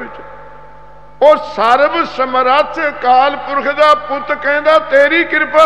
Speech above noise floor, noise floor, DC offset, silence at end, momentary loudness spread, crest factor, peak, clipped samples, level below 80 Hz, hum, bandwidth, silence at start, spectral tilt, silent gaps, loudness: 28 dB; -39 dBFS; 2%; 0 s; 7 LU; 12 dB; 0 dBFS; 0.2%; -48 dBFS; none; 9 kHz; 0 s; -4 dB/octave; none; -12 LUFS